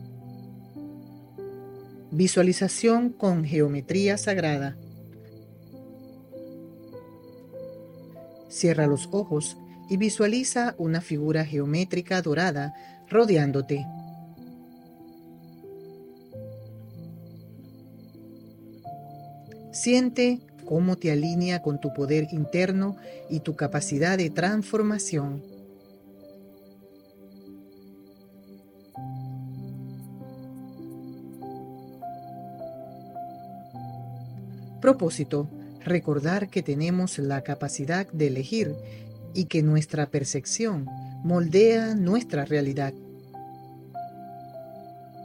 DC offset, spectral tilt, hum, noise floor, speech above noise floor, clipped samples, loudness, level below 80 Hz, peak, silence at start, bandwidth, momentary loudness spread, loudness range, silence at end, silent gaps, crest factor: under 0.1%; -5.5 dB/octave; none; -52 dBFS; 28 dB; under 0.1%; -26 LUFS; -66 dBFS; -6 dBFS; 0 s; 16 kHz; 23 LU; 20 LU; 0 s; none; 22 dB